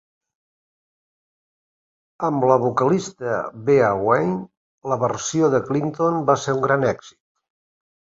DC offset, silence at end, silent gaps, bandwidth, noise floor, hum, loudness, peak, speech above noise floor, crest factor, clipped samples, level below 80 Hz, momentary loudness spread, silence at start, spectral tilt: under 0.1%; 1.05 s; 4.57-4.82 s; 7.8 kHz; under -90 dBFS; none; -20 LUFS; -2 dBFS; over 70 dB; 20 dB; under 0.1%; -60 dBFS; 8 LU; 2.2 s; -6 dB/octave